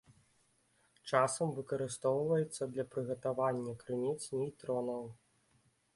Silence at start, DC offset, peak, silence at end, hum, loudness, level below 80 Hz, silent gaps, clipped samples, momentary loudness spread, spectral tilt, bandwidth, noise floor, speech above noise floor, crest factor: 1.05 s; under 0.1%; -14 dBFS; 0.8 s; none; -36 LUFS; -76 dBFS; none; under 0.1%; 8 LU; -5.5 dB/octave; 11.5 kHz; -73 dBFS; 38 dB; 24 dB